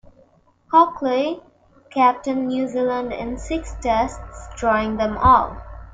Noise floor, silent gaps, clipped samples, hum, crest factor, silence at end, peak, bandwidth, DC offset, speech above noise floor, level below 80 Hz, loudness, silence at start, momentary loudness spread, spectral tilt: -56 dBFS; none; under 0.1%; none; 18 dB; 0.05 s; -2 dBFS; 9.2 kHz; under 0.1%; 36 dB; -38 dBFS; -20 LUFS; 0.7 s; 14 LU; -6 dB/octave